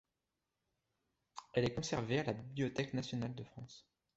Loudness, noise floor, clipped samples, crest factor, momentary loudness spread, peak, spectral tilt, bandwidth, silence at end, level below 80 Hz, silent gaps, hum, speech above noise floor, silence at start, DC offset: -39 LUFS; -89 dBFS; under 0.1%; 22 dB; 18 LU; -20 dBFS; -5.5 dB/octave; 8 kHz; 0.35 s; -66 dBFS; none; none; 50 dB; 1.35 s; under 0.1%